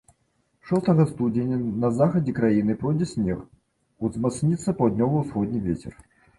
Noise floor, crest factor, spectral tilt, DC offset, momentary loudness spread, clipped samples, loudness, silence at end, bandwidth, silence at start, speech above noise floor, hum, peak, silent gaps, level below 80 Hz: -69 dBFS; 16 dB; -8.5 dB/octave; under 0.1%; 8 LU; under 0.1%; -24 LUFS; 0.45 s; 11.5 kHz; 0.65 s; 46 dB; none; -8 dBFS; none; -50 dBFS